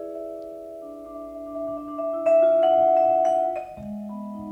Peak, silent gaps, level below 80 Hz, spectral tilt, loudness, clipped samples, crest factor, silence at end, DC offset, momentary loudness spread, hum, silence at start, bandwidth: -10 dBFS; none; -60 dBFS; -7 dB/octave; -21 LUFS; under 0.1%; 14 dB; 0 s; under 0.1%; 20 LU; none; 0 s; 8.4 kHz